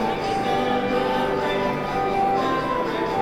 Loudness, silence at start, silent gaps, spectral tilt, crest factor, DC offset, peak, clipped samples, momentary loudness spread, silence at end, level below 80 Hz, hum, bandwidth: -23 LUFS; 0 s; none; -5.5 dB/octave; 12 dB; under 0.1%; -10 dBFS; under 0.1%; 3 LU; 0 s; -44 dBFS; none; 17.5 kHz